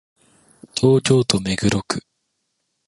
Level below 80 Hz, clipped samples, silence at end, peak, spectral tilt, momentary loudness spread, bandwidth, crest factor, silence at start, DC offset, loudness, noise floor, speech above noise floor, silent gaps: -48 dBFS; under 0.1%; 0.9 s; -2 dBFS; -5 dB/octave; 12 LU; 11.5 kHz; 20 dB; 0.75 s; under 0.1%; -19 LUFS; -73 dBFS; 56 dB; none